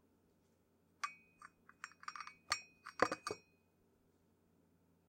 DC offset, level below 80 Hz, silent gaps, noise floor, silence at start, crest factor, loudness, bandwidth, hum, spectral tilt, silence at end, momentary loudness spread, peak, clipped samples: under 0.1%; -80 dBFS; none; -76 dBFS; 1.05 s; 36 dB; -44 LUFS; 16 kHz; none; -2 dB/octave; 1.7 s; 22 LU; -12 dBFS; under 0.1%